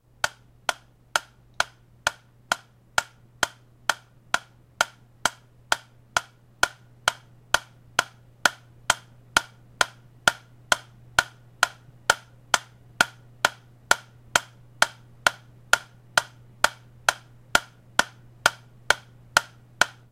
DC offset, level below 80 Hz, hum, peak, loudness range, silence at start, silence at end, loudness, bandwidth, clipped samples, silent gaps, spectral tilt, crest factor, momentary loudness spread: under 0.1%; -56 dBFS; none; 0 dBFS; 4 LU; 0.25 s; 0.25 s; -26 LUFS; 16.5 kHz; under 0.1%; none; -0.5 dB/octave; 28 dB; 6 LU